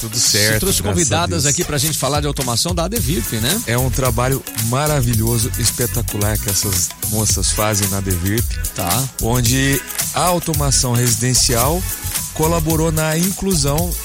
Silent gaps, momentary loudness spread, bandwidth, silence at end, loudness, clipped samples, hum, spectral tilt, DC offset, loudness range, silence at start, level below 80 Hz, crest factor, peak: none; 5 LU; 16.5 kHz; 0 s; -16 LUFS; under 0.1%; none; -3.5 dB/octave; under 0.1%; 2 LU; 0 s; -28 dBFS; 16 dB; -2 dBFS